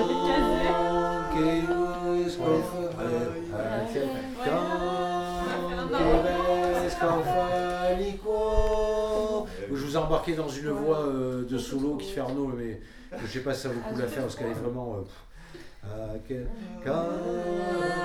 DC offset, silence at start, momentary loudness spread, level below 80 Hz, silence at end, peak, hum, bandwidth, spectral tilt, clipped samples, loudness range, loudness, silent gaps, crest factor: under 0.1%; 0 s; 11 LU; -40 dBFS; 0 s; -8 dBFS; none; 16 kHz; -6 dB/octave; under 0.1%; 8 LU; -28 LUFS; none; 18 dB